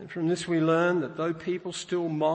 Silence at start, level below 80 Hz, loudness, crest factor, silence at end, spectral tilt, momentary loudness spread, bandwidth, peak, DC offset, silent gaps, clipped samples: 0 s; -68 dBFS; -28 LUFS; 14 dB; 0 s; -6 dB/octave; 9 LU; 8.8 kHz; -12 dBFS; under 0.1%; none; under 0.1%